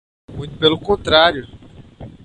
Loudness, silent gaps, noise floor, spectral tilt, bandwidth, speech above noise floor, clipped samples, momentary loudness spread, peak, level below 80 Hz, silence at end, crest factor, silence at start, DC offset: -15 LUFS; none; -38 dBFS; -5 dB/octave; 9.4 kHz; 22 dB; under 0.1%; 19 LU; 0 dBFS; -42 dBFS; 0.15 s; 18 dB; 0.3 s; under 0.1%